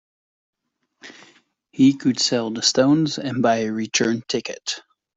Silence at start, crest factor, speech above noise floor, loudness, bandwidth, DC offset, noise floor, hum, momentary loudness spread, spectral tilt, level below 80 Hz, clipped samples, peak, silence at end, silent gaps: 1.05 s; 18 dB; 46 dB; -20 LUFS; 8.4 kHz; under 0.1%; -66 dBFS; none; 11 LU; -4 dB/octave; -64 dBFS; under 0.1%; -4 dBFS; 0.35 s; none